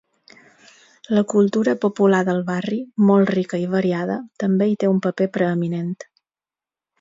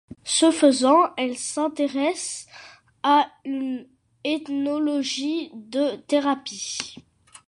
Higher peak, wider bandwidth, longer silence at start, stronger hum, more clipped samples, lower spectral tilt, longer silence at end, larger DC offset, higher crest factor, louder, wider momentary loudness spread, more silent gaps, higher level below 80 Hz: about the same, -4 dBFS vs -4 dBFS; second, 7.8 kHz vs 11.5 kHz; first, 1.1 s vs 0.25 s; neither; neither; first, -7.5 dB/octave vs -2 dB/octave; first, 0.95 s vs 0.5 s; neither; about the same, 16 dB vs 20 dB; first, -20 LUFS vs -23 LUFS; second, 8 LU vs 13 LU; neither; about the same, -66 dBFS vs -68 dBFS